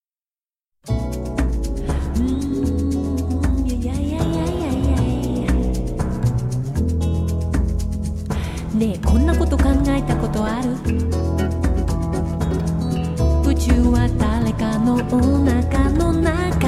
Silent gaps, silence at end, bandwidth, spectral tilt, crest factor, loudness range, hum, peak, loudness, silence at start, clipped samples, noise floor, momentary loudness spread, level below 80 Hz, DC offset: none; 0 s; 13.5 kHz; -7.5 dB/octave; 16 dB; 4 LU; none; -4 dBFS; -20 LUFS; 0.85 s; under 0.1%; under -90 dBFS; 7 LU; -24 dBFS; under 0.1%